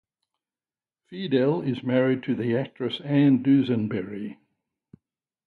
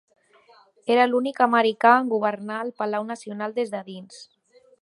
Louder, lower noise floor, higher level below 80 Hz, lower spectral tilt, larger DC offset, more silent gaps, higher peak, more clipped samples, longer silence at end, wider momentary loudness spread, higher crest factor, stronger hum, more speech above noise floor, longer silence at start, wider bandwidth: about the same, -24 LUFS vs -22 LUFS; first, under -90 dBFS vs -56 dBFS; first, -66 dBFS vs -80 dBFS; first, -9.5 dB/octave vs -5 dB/octave; neither; neither; second, -10 dBFS vs -2 dBFS; neither; first, 1.15 s vs 0.6 s; about the same, 15 LU vs 17 LU; second, 16 dB vs 22 dB; neither; first, over 67 dB vs 34 dB; first, 1.1 s vs 0.85 s; second, 4.5 kHz vs 11.5 kHz